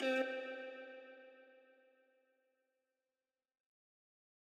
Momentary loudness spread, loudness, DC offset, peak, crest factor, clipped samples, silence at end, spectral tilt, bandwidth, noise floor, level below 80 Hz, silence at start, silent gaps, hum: 24 LU; -43 LUFS; under 0.1%; -26 dBFS; 22 dB; under 0.1%; 2.8 s; -2 dB/octave; 11.5 kHz; under -90 dBFS; under -90 dBFS; 0 s; none; none